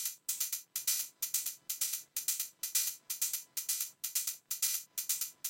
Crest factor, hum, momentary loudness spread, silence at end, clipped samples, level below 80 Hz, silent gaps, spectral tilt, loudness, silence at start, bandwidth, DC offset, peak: 22 dB; none; 3 LU; 0 s; under 0.1%; under -90 dBFS; none; 4.5 dB/octave; -34 LUFS; 0 s; 17 kHz; under 0.1%; -16 dBFS